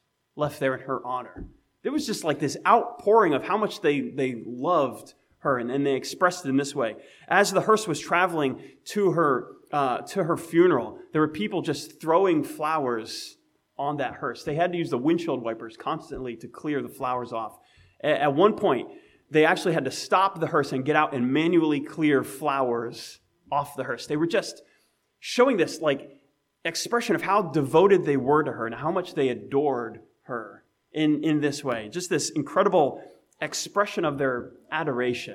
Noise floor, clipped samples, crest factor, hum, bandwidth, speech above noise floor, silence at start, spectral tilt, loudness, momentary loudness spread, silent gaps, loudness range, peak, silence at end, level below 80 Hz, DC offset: -67 dBFS; under 0.1%; 20 dB; none; 16 kHz; 43 dB; 0.35 s; -5 dB/octave; -25 LUFS; 13 LU; none; 4 LU; -4 dBFS; 0 s; -64 dBFS; under 0.1%